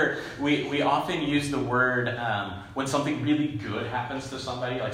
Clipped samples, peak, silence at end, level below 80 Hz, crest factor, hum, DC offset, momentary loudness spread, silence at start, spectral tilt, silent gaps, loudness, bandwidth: under 0.1%; -10 dBFS; 0 s; -56 dBFS; 18 dB; none; under 0.1%; 8 LU; 0 s; -5.5 dB/octave; none; -27 LUFS; 15.5 kHz